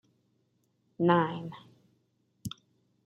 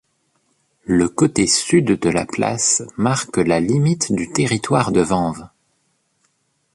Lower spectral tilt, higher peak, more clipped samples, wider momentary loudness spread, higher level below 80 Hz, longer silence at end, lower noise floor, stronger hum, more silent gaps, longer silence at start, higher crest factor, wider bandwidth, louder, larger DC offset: first, -7 dB/octave vs -4.5 dB/octave; second, -10 dBFS vs -2 dBFS; neither; first, 22 LU vs 5 LU; second, -70 dBFS vs -48 dBFS; second, 0.55 s vs 1.25 s; first, -74 dBFS vs -66 dBFS; first, 60 Hz at -60 dBFS vs none; neither; about the same, 1 s vs 0.9 s; first, 24 dB vs 16 dB; first, 13.5 kHz vs 11.5 kHz; second, -28 LUFS vs -18 LUFS; neither